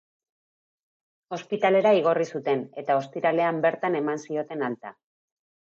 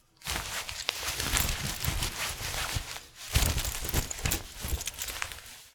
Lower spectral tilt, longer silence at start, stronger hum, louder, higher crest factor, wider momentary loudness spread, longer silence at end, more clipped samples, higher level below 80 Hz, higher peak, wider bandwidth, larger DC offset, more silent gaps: first, -6 dB/octave vs -2 dB/octave; first, 1.3 s vs 0.2 s; neither; first, -25 LUFS vs -32 LUFS; second, 18 dB vs 30 dB; first, 13 LU vs 8 LU; first, 0.7 s vs 0.05 s; neither; second, -82 dBFS vs -38 dBFS; second, -10 dBFS vs -4 dBFS; second, 7.6 kHz vs over 20 kHz; neither; neither